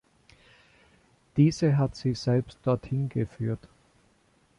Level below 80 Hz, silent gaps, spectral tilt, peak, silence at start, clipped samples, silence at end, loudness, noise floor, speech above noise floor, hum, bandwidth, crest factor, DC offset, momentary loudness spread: -56 dBFS; none; -7.5 dB/octave; -10 dBFS; 1.35 s; under 0.1%; 1 s; -27 LUFS; -65 dBFS; 39 dB; none; 10.5 kHz; 18 dB; under 0.1%; 10 LU